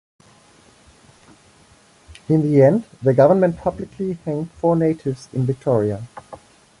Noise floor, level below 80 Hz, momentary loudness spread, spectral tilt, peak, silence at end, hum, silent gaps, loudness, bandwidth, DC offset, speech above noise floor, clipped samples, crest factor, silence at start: -52 dBFS; -52 dBFS; 13 LU; -9 dB/octave; -2 dBFS; 0.45 s; none; none; -19 LUFS; 11.5 kHz; under 0.1%; 34 dB; under 0.1%; 18 dB; 2.3 s